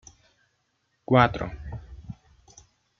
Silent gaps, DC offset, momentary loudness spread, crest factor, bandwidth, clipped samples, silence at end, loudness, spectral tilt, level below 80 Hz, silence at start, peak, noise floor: none; under 0.1%; 25 LU; 26 dB; 7.2 kHz; under 0.1%; 0.9 s; -23 LUFS; -7 dB/octave; -48 dBFS; 1.1 s; -4 dBFS; -73 dBFS